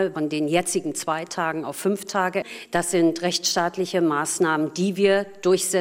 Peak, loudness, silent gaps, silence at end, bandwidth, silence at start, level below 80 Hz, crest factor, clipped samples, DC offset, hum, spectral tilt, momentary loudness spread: -6 dBFS; -23 LUFS; none; 0 s; 16 kHz; 0 s; -64 dBFS; 16 dB; under 0.1%; under 0.1%; none; -3.5 dB/octave; 6 LU